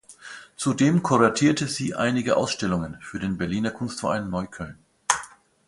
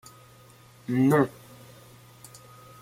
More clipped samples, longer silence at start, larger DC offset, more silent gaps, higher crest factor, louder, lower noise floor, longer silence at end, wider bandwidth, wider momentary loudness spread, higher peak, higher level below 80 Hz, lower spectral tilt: neither; second, 0.1 s vs 0.9 s; neither; neither; about the same, 22 dB vs 22 dB; about the same, -24 LUFS vs -24 LUFS; second, -44 dBFS vs -53 dBFS; second, 0.4 s vs 1.5 s; second, 11.5 kHz vs 16 kHz; second, 18 LU vs 27 LU; first, -2 dBFS vs -8 dBFS; first, -52 dBFS vs -64 dBFS; second, -5 dB/octave vs -7.5 dB/octave